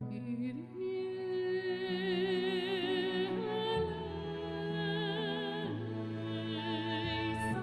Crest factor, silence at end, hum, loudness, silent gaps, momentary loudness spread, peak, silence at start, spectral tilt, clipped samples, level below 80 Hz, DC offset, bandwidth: 14 dB; 0 s; none; -36 LUFS; none; 6 LU; -22 dBFS; 0 s; -6.5 dB/octave; under 0.1%; -60 dBFS; under 0.1%; 12 kHz